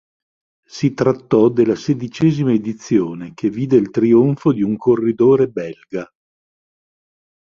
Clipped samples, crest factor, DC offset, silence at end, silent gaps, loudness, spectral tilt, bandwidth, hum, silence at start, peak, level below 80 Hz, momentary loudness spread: under 0.1%; 16 dB; under 0.1%; 1.5 s; none; -16 LUFS; -8 dB/octave; 7.2 kHz; none; 0.75 s; -2 dBFS; -56 dBFS; 13 LU